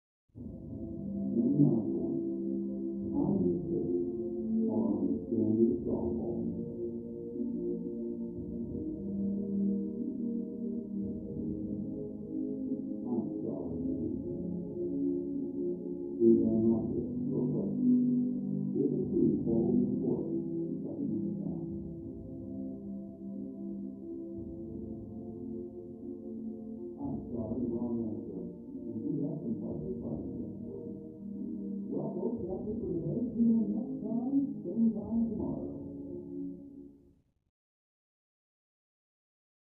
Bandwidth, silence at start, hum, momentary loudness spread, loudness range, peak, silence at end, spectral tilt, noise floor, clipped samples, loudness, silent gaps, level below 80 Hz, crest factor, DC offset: 1.2 kHz; 0.35 s; none; 14 LU; 11 LU; -14 dBFS; 2.7 s; -15 dB/octave; -65 dBFS; under 0.1%; -34 LUFS; none; -58 dBFS; 20 dB; under 0.1%